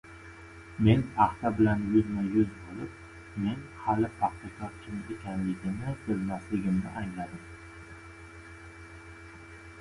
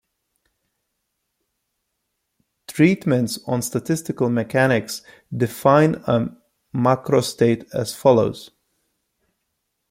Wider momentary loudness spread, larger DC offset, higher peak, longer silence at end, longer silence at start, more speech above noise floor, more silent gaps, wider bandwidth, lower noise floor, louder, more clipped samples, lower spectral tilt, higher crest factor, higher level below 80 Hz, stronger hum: first, 22 LU vs 14 LU; neither; second, -8 dBFS vs -2 dBFS; second, 0 s vs 1.45 s; second, 0.05 s vs 2.7 s; second, 19 dB vs 57 dB; neither; second, 11.5 kHz vs 16.5 kHz; second, -48 dBFS vs -76 dBFS; second, -30 LUFS vs -20 LUFS; neither; first, -8 dB/octave vs -6 dB/octave; about the same, 24 dB vs 20 dB; first, -50 dBFS vs -58 dBFS; neither